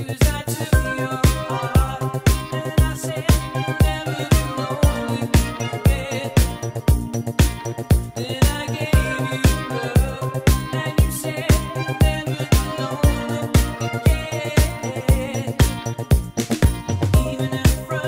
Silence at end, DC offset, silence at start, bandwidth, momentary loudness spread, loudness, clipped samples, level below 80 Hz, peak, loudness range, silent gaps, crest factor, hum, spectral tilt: 0 s; under 0.1%; 0 s; 16.5 kHz; 5 LU; -21 LUFS; under 0.1%; -24 dBFS; -6 dBFS; 1 LU; none; 14 dB; none; -5.5 dB/octave